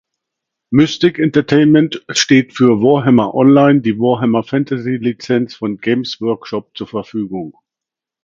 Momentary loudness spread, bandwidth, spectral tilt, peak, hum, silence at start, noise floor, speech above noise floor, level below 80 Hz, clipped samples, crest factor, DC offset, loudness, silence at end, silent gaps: 12 LU; 7.6 kHz; -6 dB/octave; 0 dBFS; none; 0.7 s; -85 dBFS; 72 dB; -54 dBFS; under 0.1%; 14 dB; under 0.1%; -14 LUFS; 0.75 s; none